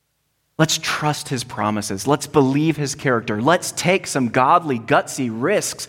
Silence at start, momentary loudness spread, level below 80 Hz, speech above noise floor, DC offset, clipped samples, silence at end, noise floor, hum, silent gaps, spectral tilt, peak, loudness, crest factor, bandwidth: 0.6 s; 6 LU; -56 dBFS; 50 dB; under 0.1%; under 0.1%; 0 s; -69 dBFS; none; none; -4.5 dB/octave; -2 dBFS; -19 LUFS; 18 dB; 17 kHz